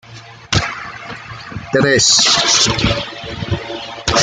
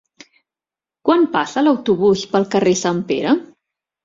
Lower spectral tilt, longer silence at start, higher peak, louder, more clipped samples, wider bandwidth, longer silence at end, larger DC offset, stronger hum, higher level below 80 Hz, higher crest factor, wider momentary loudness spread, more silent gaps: second, -2.5 dB/octave vs -5 dB/octave; second, 0.05 s vs 1.05 s; about the same, 0 dBFS vs -2 dBFS; first, -13 LUFS vs -17 LUFS; neither; first, 12 kHz vs 7.8 kHz; second, 0 s vs 0.6 s; neither; neither; first, -36 dBFS vs -58 dBFS; about the same, 16 dB vs 16 dB; first, 20 LU vs 4 LU; neither